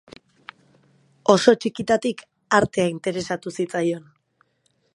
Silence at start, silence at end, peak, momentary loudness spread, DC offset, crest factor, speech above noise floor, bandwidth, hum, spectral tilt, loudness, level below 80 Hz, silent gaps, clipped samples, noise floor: 1.3 s; 0.95 s; 0 dBFS; 12 LU; under 0.1%; 24 dB; 47 dB; 11.5 kHz; none; -5 dB/octave; -22 LUFS; -58 dBFS; none; under 0.1%; -68 dBFS